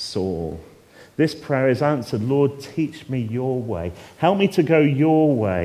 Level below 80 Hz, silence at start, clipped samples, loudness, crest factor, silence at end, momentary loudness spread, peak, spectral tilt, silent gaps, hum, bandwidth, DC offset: -46 dBFS; 0 s; under 0.1%; -21 LUFS; 18 dB; 0 s; 12 LU; -2 dBFS; -7.5 dB/octave; none; none; 15 kHz; under 0.1%